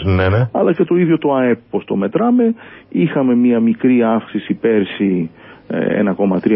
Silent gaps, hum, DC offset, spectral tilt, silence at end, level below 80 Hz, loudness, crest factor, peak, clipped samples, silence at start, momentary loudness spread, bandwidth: none; none; under 0.1%; -13 dB/octave; 0 s; -38 dBFS; -15 LUFS; 14 dB; 0 dBFS; under 0.1%; 0 s; 7 LU; 5.2 kHz